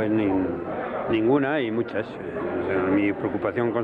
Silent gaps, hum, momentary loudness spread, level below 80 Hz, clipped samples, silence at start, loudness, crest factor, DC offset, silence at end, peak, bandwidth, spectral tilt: none; none; 8 LU; -56 dBFS; under 0.1%; 0 s; -25 LUFS; 14 dB; under 0.1%; 0 s; -10 dBFS; 4.8 kHz; -9 dB/octave